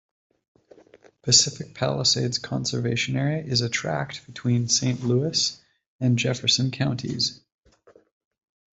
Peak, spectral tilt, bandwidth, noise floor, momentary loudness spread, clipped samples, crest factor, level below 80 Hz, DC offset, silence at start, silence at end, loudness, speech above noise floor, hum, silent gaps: -2 dBFS; -3.5 dB/octave; 8.2 kHz; -57 dBFS; 9 LU; under 0.1%; 24 dB; -60 dBFS; under 0.1%; 1.25 s; 1.35 s; -23 LUFS; 33 dB; none; 5.86-5.99 s